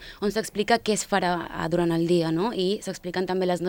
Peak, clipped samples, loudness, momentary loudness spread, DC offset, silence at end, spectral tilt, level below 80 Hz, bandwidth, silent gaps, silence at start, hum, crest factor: -4 dBFS; under 0.1%; -25 LUFS; 6 LU; under 0.1%; 0 s; -5 dB/octave; -52 dBFS; 18.5 kHz; none; 0 s; none; 20 dB